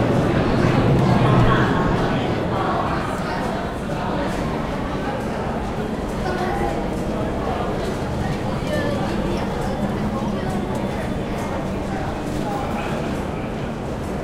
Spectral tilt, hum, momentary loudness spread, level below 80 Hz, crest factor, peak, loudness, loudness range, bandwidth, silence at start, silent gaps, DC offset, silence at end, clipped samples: -7 dB/octave; none; 8 LU; -32 dBFS; 16 dB; -4 dBFS; -22 LUFS; 6 LU; 15.5 kHz; 0 s; none; under 0.1%; 0 s; under 0.1%